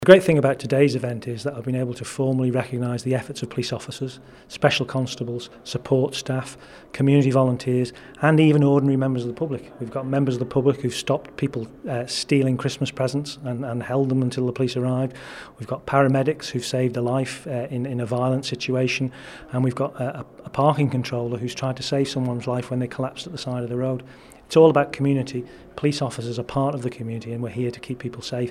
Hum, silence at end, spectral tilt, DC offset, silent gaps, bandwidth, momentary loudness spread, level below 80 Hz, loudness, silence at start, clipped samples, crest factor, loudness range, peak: none; 0 s; -6.5 dB/octave; under 0.1%; none; 13 kHz; 13 LU; -56 dBFS; -23 LUFS; 0 s; under 0.1%; 22 dB; 6 LU; 0 dBFS